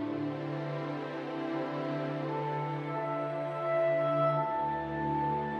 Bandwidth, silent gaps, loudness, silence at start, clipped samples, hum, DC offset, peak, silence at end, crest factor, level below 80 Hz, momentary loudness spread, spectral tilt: 6.6 kHz; none; -33 LUFS; 0 s; under 0.1%; none; under 0.1%; -18 dBFS; 0 s; 14 dB; -62 dBFS; 8 LU; -8.5 dB/octave